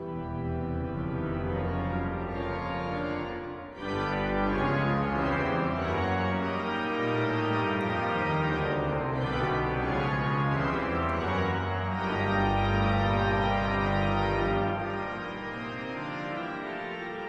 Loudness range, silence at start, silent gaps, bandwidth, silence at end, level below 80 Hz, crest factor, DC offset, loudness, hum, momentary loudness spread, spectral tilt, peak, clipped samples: 5 LU; 0 s; none; 8 kHz; 0 s; -42 dBFS; 14 dB; under 0.1%; -29 LUFS; none; 9 LU; -7.5 dB/octave; -14 dBFS; under 0.1%